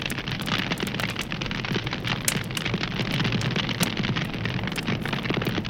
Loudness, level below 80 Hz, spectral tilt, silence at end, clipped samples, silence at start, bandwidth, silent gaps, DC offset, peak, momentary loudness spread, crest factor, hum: -27 LUFS; -44 dBFS; -4 dB/octave; 0 s; under 0.1%; 0 s; 17 kHz; none; under 0.1%; -4 dBFS; 4 LU; 24 dB; none